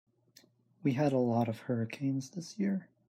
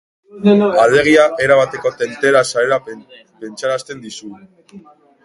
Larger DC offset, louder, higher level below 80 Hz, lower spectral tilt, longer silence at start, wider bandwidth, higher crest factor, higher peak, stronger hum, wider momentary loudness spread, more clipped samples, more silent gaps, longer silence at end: neither; second, -33 LUFS vs -14 LUFS; second, -78 dBFS vs -54 dBFS; first, -7.5 dB/octave vs -5 dB/octave; first, 0.85 s vs 0.35 s; first, 14.5 kHz vs 11.5 kHz; about the same, 16 dB vs 16 dB; second, -18 dBFS vs 0 dBFS; neither; second, 6 LU vs 21 LU; neither; neither; second, 0.25 s vs 0.45 s